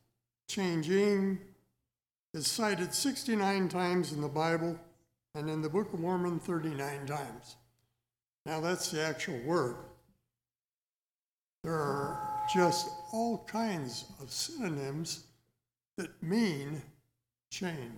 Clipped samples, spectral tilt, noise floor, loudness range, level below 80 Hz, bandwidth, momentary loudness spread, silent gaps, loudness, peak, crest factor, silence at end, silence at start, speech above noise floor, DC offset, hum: under 0.1%; -4.5 dB/octave; under -90 dBFS; 5 LU; -70 dBFS; 18 kHz; 13 LU; 2.22-2.33 s, 8.41-8.45 s, 10.65-10.69 s, 10.75-10.97 s, 11.11-11.64 s; -34 LUFS; -16 dBFS; 20 dB; 0 s; 0.5 s; over 57 dB; under 0.1%; none